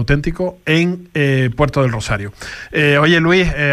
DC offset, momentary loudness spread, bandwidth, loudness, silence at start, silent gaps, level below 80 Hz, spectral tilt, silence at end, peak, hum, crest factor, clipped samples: under 0.1%; 10 LU; 13.5 kHz; -15 LUFS; 0 s; none; -30 dBFS; -6 dB/octave; 0 s; -2 dBFS; none; 12 dB; under 0.1%